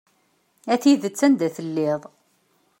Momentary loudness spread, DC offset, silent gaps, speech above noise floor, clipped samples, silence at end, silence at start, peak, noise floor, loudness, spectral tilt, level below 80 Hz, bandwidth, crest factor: 9 LU; under 0.1%; none; 45 dB; under 0.1%; 0.8 s; 0.65 s; -6 dBFS; -65 dBFS; -21 LUFS; -5 dB/octave; -74 dBFS; 16.5 kHz; 18 dB